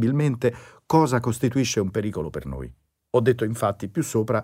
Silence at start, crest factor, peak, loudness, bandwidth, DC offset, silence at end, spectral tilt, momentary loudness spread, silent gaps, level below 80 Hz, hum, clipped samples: 0 s; 16 dB; -6 dBFS; -24 LUFS; 16 kHz; under 0.1%; 0 s; -6 dB/octave; 12 LU; none; -48 dBFS; none; under 0.1%